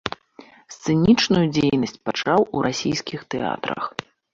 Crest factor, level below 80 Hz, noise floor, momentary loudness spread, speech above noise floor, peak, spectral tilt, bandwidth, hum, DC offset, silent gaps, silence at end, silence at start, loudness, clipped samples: 20 dB; -50 dBFS; -48 dBFS; 14 LU; 27 dB; -2 dBFS; -5.5 dB/octave; 7.8 kHz; none; under 0.1%; none; 0.3 s; 0.05 s; -21 LUFS; under 0.1%